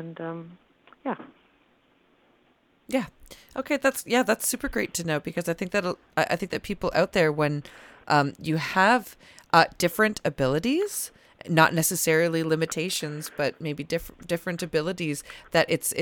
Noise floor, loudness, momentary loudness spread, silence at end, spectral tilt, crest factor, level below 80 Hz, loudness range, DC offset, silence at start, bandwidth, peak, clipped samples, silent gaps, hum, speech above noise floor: -64 dBFS; -25 LUFS; 14 LU; 0 s; -4 dB/octave; 22 dB; -54 dBFS; 6 LU; under 0.1%; 0 s; 19 kHz; -4 dBFS; under 0.1%; none; none; 38 dB